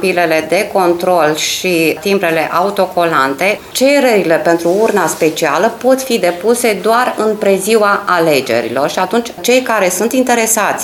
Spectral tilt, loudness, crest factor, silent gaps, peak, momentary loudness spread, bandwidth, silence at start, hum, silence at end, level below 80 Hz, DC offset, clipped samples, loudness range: -3.5 dB/octave; -12 LUFS; 12 dB; none; 0 dBFS; 3 LU; 17.5 kHz; 0 s; none; 0 s; -54 dBFS; under 0.1%; under 0.1%; 1 LU